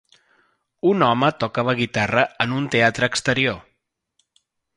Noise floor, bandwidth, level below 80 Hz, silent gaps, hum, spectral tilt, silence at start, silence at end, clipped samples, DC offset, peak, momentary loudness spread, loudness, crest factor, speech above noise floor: -73 dBFS; 11.5 kHz; -56 dBFS; none; none; -5 dB/octave; 0.85 s; 1.15 s; under 0.1%; under 0.1%; -2 dBFS; 5 LU; -20 LUFS; 20 dB; 53 dB